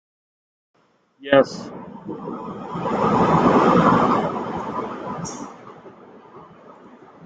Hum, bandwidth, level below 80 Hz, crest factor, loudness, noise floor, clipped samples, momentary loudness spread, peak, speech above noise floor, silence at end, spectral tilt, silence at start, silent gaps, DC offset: none; 9 kHz; -52 dBFS; 20 dB; -20 LUFS; -46 dBFS; under 0.1%; 21 LU; -2 dBFS; 27 dB; 0 s; -6.5 dB/octave; 1.2 s; none; under 0.1%